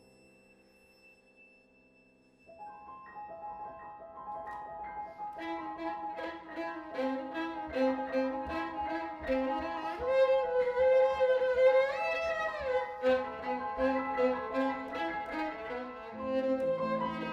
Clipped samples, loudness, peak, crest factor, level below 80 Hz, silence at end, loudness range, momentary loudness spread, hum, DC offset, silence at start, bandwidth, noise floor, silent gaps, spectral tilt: under 0.1%; -33 LUFS; -16 dBFS; 18 dB; -62 dBFS; 0 s; 18 LU; 17 LU; none; under 0.1%; 1.4 s; 7.2 kHz; -65 dBFS; none; -6 dB/octave